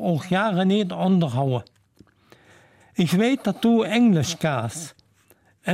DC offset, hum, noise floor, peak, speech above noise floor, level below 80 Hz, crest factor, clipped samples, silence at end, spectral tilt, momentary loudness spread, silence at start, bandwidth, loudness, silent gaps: under 0.1%; none; -59 dBFS; -10 dBFS; 38 dB; -64 dBFS; 14 dB; under 0.1%; 0 s; -6 dB/octave; 13 LU; 0 s; 15.5 kHz; -22 LUFS; none